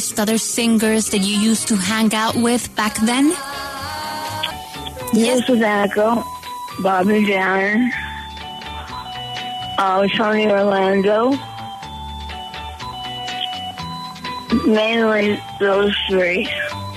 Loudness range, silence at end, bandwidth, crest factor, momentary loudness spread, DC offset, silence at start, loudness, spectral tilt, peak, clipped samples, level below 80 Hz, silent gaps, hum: 4 LU; 0 s; 13.5 kHz; 14 dB; 14 LU; under 0.1%; 0 s; -18 LUFS; -4 dB/octave; -4 dBFS; under 0.1%; -44 dBFS; none; none